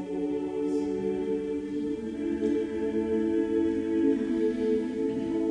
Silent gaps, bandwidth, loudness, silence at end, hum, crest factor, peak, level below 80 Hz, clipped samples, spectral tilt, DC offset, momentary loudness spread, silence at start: none; 10 kHz; -29 LUFS; 0 s; none; 14 dB; -14 dBFS; -56 dBFS; under 0.1%; -7.5 dB/octave; under 0.1%; 6 LU; 0 s